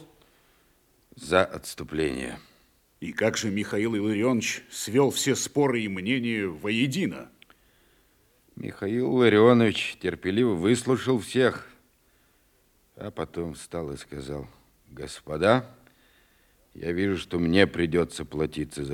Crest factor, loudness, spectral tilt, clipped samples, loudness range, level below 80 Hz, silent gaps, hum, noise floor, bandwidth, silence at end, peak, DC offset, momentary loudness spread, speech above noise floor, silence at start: 22 dB; -26 LUFS; -5 dB/octave; under 0.1%; 8 LU; -56 dBFS; none; none; -64 dBFS; 17 kHz; 0 s; -4 dBFS; under 0.1%; 16 LU; 39 dB; 0 s